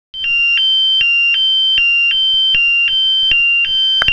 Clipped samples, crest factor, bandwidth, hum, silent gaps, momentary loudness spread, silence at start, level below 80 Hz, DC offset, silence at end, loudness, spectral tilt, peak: under 0.1%; 12 dB; 5.4 kHz; none; none; 1 LU; 0.15 s; -46 dBFS; under 0.1%; 0 s; -10 LUFS; 0 dB/octave; 0 dBFS